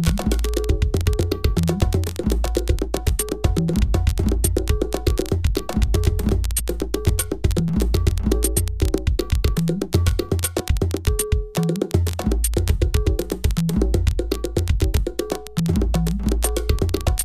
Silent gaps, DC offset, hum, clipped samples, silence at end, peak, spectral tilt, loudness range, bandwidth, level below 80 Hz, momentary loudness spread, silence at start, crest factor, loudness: none; 1%; none; under 0.1%; 0 s; -4 dBFS; -5.5 dB/octave; 1 LU; 15.5 kHz; -24 dBFS; 3 LU; 0 s; 16 dB; -22 LUFS